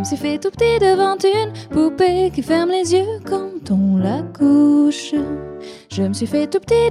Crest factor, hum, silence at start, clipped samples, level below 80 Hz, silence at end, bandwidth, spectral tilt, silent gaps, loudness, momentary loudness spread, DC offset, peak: 14 dB; none; 0 s; under 0.1%; -44 dBFS; 0 s; 12.5 kHz; -6 dB/octave; none; -17 LUFS; 10 LU; under 0.1%; -4 dBFS